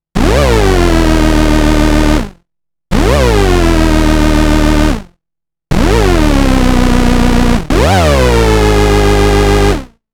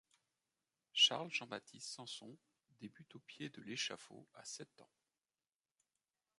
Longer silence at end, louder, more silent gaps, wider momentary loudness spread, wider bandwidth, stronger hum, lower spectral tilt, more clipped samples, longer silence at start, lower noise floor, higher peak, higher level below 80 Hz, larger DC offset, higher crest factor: second, 0.25 s vs 1.55 s; first, -10 LUFS vs -39 LUFS; neither; second, 5 LU vs 26 LU; first, 18 kHz vs 11.5 kHz; neither; first, -5.5 dB/octave vs -1 dB/octave; neither; second, 0.15 s vs 0.95 s; second, -82 dBFS vs under -90 dBFS; first, 0 dBFS vs -20 dBFS; first, -12 dBFS vs under -90 dBFS; neither; second, 8 dB vs 26 dB